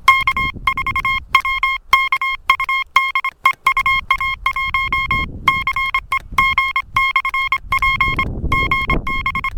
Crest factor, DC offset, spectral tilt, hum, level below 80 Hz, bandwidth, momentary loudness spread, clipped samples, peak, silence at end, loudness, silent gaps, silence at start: 18 dB; under 0.1%; -3 dB/octave; none; -32 dBFS; 17.5 kHz; 4 LU; under 0.1%; 0 dBFS; 0 s; -16 LUFS; none; 0 s